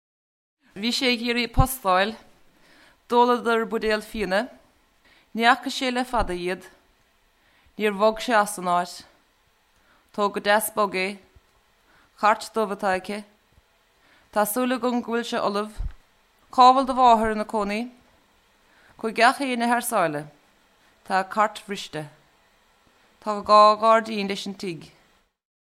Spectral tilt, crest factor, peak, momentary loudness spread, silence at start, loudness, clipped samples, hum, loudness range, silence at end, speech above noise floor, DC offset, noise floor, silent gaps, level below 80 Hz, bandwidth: -4 dB/octave; 22 dB; -2 dBFS; 17 LU; 0.75 s; -22 LUFS; under 0.1%; none; 6 LU; 0.85 s; 41 dB; under 0.1%; -64 dBFS; none; -42 dBFS; 16 kHz